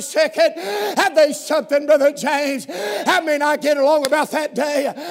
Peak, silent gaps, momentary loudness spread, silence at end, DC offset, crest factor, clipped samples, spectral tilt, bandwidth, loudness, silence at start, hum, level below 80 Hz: 0 dBFS; none; 7 LU; 0 s; under 0.1%; 18 dB; under 0.1%; -2.5 dB/octave; 16 kHz; -18 LUFS; 0 s; none; -80 dBFS